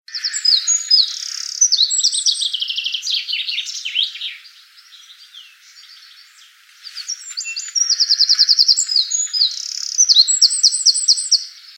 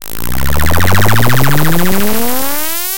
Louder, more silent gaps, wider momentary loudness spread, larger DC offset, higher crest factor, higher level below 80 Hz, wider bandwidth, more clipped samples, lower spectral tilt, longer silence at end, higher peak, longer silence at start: about the same, -14 LUFS vs -13 LUFS; neither; first, 14 LU vs 5 LU; second, under 0.1% vs 40%; about the same, 18 dB vs 14 dB; second, under -90 dBFS vs -26 dBFS; second, 17.5 kHz vs over 20 kHz; neither; second, 12 dB/octave vs -4.5 dB/octave; about the same, 0.05 s vs 0 s; about the same, 0 dBFS vs 0 dBFS; about the same, 0.1 s vs 0 s